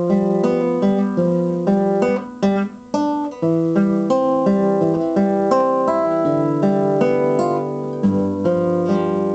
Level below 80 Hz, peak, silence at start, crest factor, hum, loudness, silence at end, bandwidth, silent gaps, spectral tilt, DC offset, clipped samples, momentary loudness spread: -56 dBFS; -2 dBFS; 0 s; 14 dB; none; -18 LUFS; 0 s; 8.2 kHz; none; -8.5 dB/octave; under 0.1%; under 0.1%; 4 LU